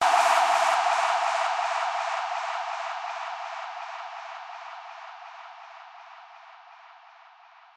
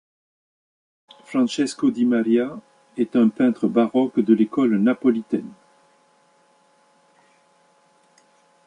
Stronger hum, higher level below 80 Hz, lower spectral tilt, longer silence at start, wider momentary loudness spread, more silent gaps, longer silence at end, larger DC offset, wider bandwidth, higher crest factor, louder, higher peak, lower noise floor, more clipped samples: neither; second, under -90 dBFS vs -70 dBFS; second, 1.5 dB/octave vs -6.5 dB/octave; second, 0 s vs 1.3 s; first, 24 LU vs 10 LU; neither; second, 0.8 s vs 3.15 s; neither; first, 15.5 kHz vs 10.5 kHz; about the same, 20 dB vs 18 dB; second, -26 LUFS vs -20 LUFS; second, -8 dBFS vs -4 dBFS; second, -53 dBFS vs -59 dBFS; neither